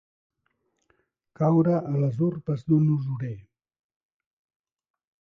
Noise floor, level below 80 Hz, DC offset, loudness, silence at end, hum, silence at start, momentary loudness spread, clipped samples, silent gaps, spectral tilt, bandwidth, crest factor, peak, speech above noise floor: -75 dBFS; -62 dBFS; under 0.1%; -25 LUFS; 1.8 s; none; 1.4 s; 11 LU; under 0.1%; none; -11.5 dB/octave; 4.7 kHz; 16 dB; -10 dBFS; 51 dB